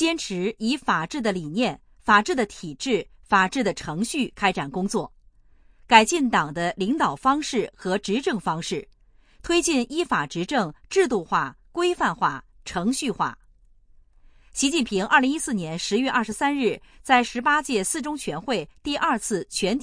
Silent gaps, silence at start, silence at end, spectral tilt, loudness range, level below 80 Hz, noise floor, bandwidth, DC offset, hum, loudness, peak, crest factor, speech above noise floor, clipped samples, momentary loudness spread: none; 0 s; 0 s; -3.5 dB/octave; 3 LU; -52 dBFS; -55 dBFS; 10.5 kHz; under 0.1%; none; -23 LUFS; 0 dBFS; 24 dB; 31 dB; under 0.1%; 9 LU